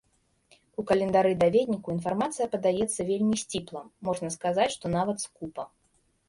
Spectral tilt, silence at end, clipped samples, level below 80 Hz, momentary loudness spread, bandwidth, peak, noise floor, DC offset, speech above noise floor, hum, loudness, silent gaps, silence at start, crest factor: -5 dB/octave; 0.6 s; under 0.1%; -60 dBFS; 15 LU; 11.5 kHz; -10 dBFS; -69 dBFS; under 0.1%; 42 dB; none; -27 LUFS; none; 0.8 s; 18 dB